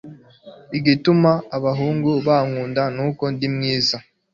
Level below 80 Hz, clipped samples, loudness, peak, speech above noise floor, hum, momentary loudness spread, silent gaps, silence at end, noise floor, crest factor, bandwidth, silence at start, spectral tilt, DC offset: -58 dBFS; under 0.1%; -20 LUFS; -4 dBFS; 26 dB; none; 7 LU; none; 0.35 s; -44 dBFS; 16 dB; 7.4 kHz; 0.05 s; -6.5 dB/octave; under 0.1%